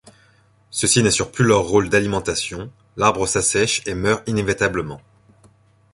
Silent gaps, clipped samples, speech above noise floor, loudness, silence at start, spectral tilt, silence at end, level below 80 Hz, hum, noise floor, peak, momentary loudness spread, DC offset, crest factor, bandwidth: none; under 0.1%; 37 dB; -19 LUFS; 0.75 s; -3.5 dB/octave; 0.95 s; -44 dBFS; none; -56 dBFS; -2 dBFS; 13 LU; under 0.1%; 18 dB; 11.5 kHz